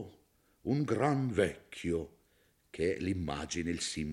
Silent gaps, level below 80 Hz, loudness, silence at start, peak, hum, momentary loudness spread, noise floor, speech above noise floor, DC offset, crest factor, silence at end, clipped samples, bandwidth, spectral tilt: none; -58 dBFS; -34 LUFS; 0 s; -16 dBFS; none; 12 LU; -70 dBFS; 37 dB; under 0.1%; 20 dB; 0 s; under 0.1%; 13 kHz; -5.5 dB/octave